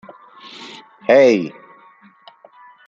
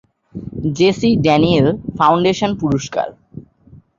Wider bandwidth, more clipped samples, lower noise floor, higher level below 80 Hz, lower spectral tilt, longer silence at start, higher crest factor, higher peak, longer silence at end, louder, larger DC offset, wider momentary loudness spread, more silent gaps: about the same, 7.4 kHz vs 7.6 kHz; neither; about the same, -49 dBFS vs -46 dBFS; second, -72 dBFS vs -44 dBFS; about the same, -5.5 dB/octave vs -6.5 dB/octave; first, 0.6 s vs 0.35 s; about the same, 18 dB vs 16 dB; about the same, -2 dBFS vs -2 dBFS; first, 1.4 s vs 0.2 s; about the same, -14 LUFS vs -15 LUFS; neither; first, 25 LU vs 14 LU; neither